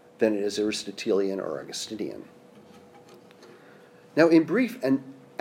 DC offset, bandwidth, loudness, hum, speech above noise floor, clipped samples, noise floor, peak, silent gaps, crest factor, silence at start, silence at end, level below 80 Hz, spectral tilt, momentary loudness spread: under 0.1%; 16 kHz; -26 LUFS; none; 27 dB; under 0.1%; -52 dBFS; -6 dBFS; none; 22 dB; 0.2 s; 0.25 s; -74 dBFS; -5 dB/octave; 15 LU